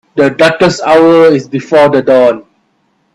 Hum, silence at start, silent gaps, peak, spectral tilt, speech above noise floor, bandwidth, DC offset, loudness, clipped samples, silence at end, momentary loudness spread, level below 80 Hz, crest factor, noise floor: none; 0.15 s; none; 0 dBFS; -5.5 dB/octave; 50 dB; 11.5 kHz; under 0.1%; -8 LUFS; 0.1%; 0.75 s; 6 LU; -48 dBFS; 8 dB; -57 dBFS